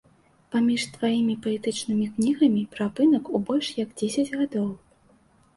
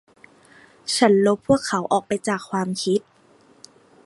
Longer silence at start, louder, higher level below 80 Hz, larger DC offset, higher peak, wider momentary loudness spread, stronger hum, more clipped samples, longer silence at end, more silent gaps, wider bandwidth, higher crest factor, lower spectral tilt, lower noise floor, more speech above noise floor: second, 0.5 s vs 0.85 s; second, -25 LUFS vs -21 LUFS; second, -64 dBFS vs -56 dBFS; neither; second, -10 dBFS vs -2 dBFS; about the same, 8 LU vs 9 LU; neither; neither; second, 0.8 s vs 1.05 s; neither; about the same, 11.5 kHz vs 11.5 kHz; about the same, 16 dB vs 20 dB; about the same, -5 dB/octave vs -4.5 dB/octave; first, -59 dBFS vs -55 dBFS; about the same, 35 dB vs 35 dB